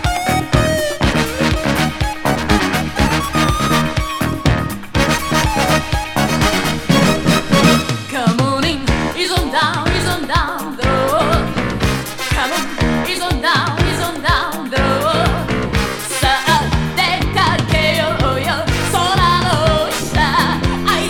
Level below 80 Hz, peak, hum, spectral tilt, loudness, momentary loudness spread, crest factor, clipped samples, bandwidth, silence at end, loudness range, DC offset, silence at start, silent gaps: -26 dBFS; 0 dBFS; none; -4.5 dB/octave; -16 LUFS; 5 LU; 16 dB; under 0.1%; 20 kHz; 0 s; 2 LU; under 0.1%; 0 s; none